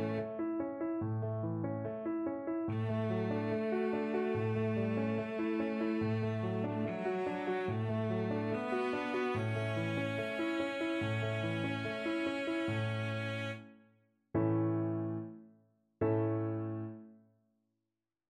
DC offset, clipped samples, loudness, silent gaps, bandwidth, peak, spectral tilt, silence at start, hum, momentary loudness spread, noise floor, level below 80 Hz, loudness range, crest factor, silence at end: under 0.1%; under 0.1%; -36 LUFS; none; 9.6 kHz; -20 dBFS; -8 dB/octave; 0 s; none; 4 LU; -90 dBFS; -68 dBFS; 2 LU; 14 dB; 1.1 s